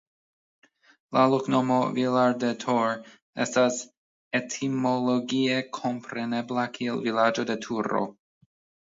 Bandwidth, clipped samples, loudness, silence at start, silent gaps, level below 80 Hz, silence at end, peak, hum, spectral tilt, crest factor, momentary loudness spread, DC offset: 7.8 kHz; under 0.1%; -26 LUFS; 1.1 s; 3.22-3.33 s, 3.97-4.31 s; -74 dBFS; 0.75 s; -6 dBFS; none; -5 dB/octave; 20 dB; 8 LU; under 0.1%